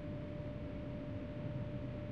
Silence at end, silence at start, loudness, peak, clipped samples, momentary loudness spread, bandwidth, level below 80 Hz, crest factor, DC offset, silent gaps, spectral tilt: 0 s; 0 s; -45 LUFS; -32 dBFS; under 0.1%; 2 LU; 6.4 kHz; -54 dBFS; 12 dB; 0.1%; none; -9.5 dB/octave